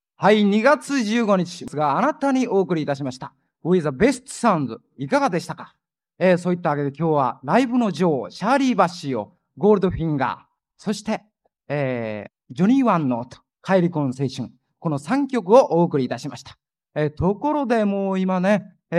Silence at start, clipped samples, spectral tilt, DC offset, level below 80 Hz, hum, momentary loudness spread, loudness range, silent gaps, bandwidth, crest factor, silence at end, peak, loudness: 0.2 s; under 0.1%; -6.5 dB/octave; under 0.1%; -52 dBFS; none; 14 LU; 3 LU; none; 12 kHz; 20 dB; 0 s; -2 dBFS; -21 LUFS